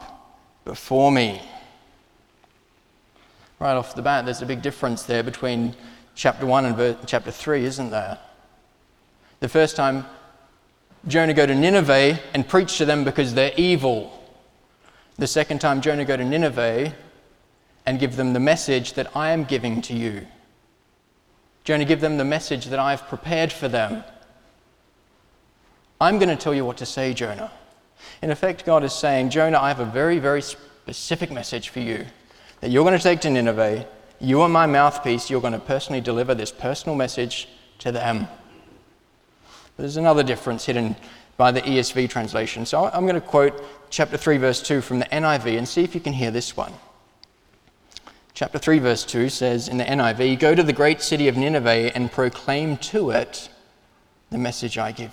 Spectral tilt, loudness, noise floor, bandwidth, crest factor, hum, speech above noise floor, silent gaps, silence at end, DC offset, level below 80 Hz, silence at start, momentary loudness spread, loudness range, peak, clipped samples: -5 dB/octave; -21 LUFS; -62 dBFS; 16.5 kHz; 20 dB; none; 41 dB; none; 0 s; under 0.1%; -54 dBFS; 0 s; 13 LU; 6 LU; -2 dBFS; under 0.1%